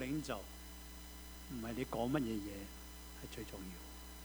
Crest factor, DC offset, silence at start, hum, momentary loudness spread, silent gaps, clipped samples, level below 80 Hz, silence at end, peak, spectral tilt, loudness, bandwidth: 22 dB; under 0.1%; 0 s; none; 14 LU; none; under 0.1%; -54 dBFS; 0 s; -24 dBFS; -5 dB/octave; -45 LUFS; over 20 kHz